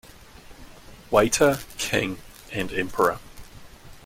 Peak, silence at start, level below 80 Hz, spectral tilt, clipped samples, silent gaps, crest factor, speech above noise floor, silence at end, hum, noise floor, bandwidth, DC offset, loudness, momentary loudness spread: -4 dBFS; 0.5 s; -48 dBFS; -3.5 dB/octave; under 0.1%; none; 22 dB; 23 dB; 0.05 s; none; -46 dBFS; 16.5 kHz; under 0.1%; -24 LUFS; 13 LU